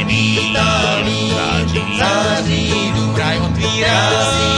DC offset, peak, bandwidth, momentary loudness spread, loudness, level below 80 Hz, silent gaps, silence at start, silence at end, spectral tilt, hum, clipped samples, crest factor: under 0.1%; 0 dBFS; 10.5 kHz; 3 LU; -15 LUFS; -32 dBFS; none; 0 s; 0 s; -4 dB/octave; none; under 0.1%; 16 dB